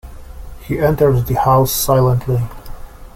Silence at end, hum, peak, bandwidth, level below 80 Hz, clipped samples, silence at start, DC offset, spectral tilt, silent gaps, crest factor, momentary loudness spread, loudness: 0.05 s; none; -2 dBFS; 16.5 kHz; -32 dBFS; under 0.1%; 0.05 s; under 0.1%; -6 dB/octave; none; 14 dB; 11 LU; -15 LUFS